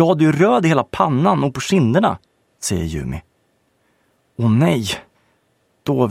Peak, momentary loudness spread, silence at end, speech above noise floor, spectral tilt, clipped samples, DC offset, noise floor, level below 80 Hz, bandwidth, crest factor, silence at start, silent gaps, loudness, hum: 0 dBFS; 15 LU; 0 s; 47 dB; -6 dB/octave; under 0.1%; under 0.1%; -63 dBFS; -44 dBFS; 15.5 kHz; 18 dB; 0 s; none; -18 LUFS; none